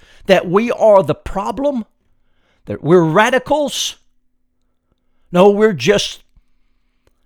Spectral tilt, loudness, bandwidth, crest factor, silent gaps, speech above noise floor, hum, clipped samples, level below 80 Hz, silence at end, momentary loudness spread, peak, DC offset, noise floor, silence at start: -5 dB/octave; -14 LUFS; 18.5 kHz; 16 dB; none; 49 dB; none; under 0.1%; -42 dBFS; 1.1 s; 12 LU; 0 dBFS; under 0.1%; -62 dBFS; 0.3 s